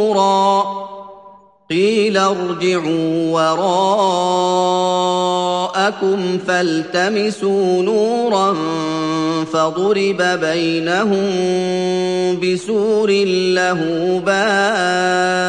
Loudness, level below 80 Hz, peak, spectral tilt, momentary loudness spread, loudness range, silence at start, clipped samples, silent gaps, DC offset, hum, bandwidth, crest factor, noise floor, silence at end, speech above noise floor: -16 LUFS; -64 dBFS; -2 dBFS; -4.5 dB/octave; 4 LU; 1 LU; 0 s; under 0.1%; none; under 0.1%; none; 10.5 kHz; 14 dB; -44 dBFS; 0 s; 28 dB